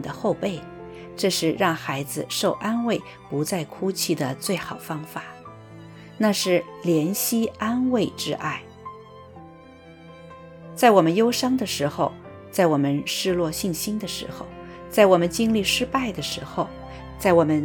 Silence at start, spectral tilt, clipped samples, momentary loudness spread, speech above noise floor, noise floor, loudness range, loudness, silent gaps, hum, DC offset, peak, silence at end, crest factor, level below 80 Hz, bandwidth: 0 s; -4.5 dB/octave; under 0.1%; 21 LU; 23 dB; -46 dBFS; 5 LU; -23 LUFS; none; none; under 0.1%; -2 dBFS; 0 s; 22 dB; -52 dBFS; 19 kHz